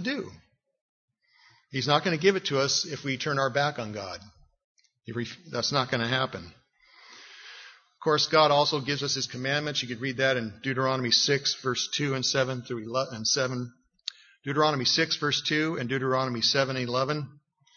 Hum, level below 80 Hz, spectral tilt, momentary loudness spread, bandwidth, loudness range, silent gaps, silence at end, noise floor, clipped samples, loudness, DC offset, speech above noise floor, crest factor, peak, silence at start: none; -68 dBFS; -3.5 dB/octave; 17 LU; 7.4 kHz; 5 LU; 0.81-1.08 s, 4.64-4.76 s; 0.45 s; -62 dBFS; under 0.1%; -26 LUFS; under 0.1%; 34 dB; 22 dB; -8 dBFS; 0 s